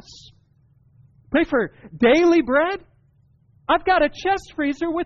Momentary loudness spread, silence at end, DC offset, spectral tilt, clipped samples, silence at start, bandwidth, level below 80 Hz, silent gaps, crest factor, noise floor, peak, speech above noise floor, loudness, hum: 10 LU; 0 s; under 0.1%; -2.5 dB/octave; under 0.1%; 1.3 s; 7.4 kHz; -48 dBFS; none; 14 dB; -58 dBFS; -8 dBFS; 39 dB; -20 LUFS; none